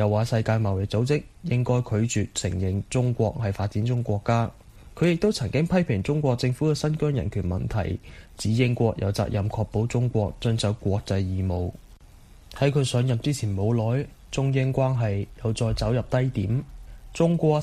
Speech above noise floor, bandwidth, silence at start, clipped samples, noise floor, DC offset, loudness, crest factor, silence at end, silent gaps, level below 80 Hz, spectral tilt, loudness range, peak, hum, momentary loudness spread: 25 dB; 13 kHz; 0 s; under 0.1%; -49 dBFS; under 0.1%; -25 LUFS; 16 dB; 0 s; none; -44 dBFS; -6.5 dB/octave; 2 LU; -8 dBFS; none; 5 LU